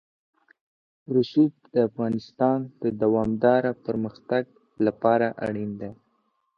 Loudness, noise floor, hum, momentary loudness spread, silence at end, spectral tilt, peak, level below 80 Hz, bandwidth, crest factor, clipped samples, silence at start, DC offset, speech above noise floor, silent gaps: -25 LUFS; -71 dBFS; none; 9 LU; 0.65 s; -9 dB/octave; -6 dBFS; -60 dBFS; 6.4 kHz; 20 dB; under 0.1%; 1.1 s; under 0.1%; 47 dB; none